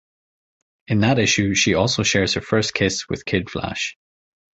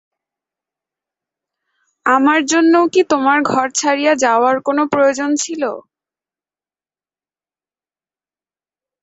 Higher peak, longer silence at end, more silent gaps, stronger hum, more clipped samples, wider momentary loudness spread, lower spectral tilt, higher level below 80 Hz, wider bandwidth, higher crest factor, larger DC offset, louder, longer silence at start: about the same, -4 dBFS vs -2 dBFS; second, 0.65 s vs 3.2 s; neither; neither; neither; about the same, 9 LU vs 8 LU; about the same, -4 dB/octave vs -3 dB/octave; first, -44 dBFS vs -64 dBFS; about the same, 8.2 kHz vs 8.2 kHz; about the same, 18 dB vs 16 dB; neither; second, -20 LUFS vs -14 LUFS; second, 0.9 s vs 2.05 s